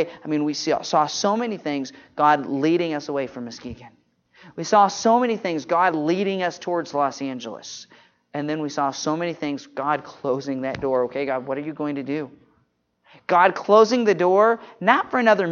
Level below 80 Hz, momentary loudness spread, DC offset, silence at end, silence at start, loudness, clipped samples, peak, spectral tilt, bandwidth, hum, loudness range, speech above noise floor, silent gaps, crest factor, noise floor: -64 dBFS; 15 LU; under 0.1%; 0 s; 0 s; -22 LUFS; under 0.1%; 0 dBFS; -4.5 dB/octave; 7.4 kHz; none; 7 LU; 45 dB; none; 22 dB; -67 dBFS